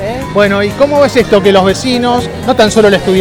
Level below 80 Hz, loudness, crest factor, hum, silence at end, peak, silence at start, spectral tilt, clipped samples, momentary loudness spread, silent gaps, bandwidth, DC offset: -32 dBFS; -9 LUFS; 8 dB; none; 0 s; 0 dBFS; 0 s; -5 dB/octave; 1%; 6 LU; none; 17.5 kHz; under 0.1%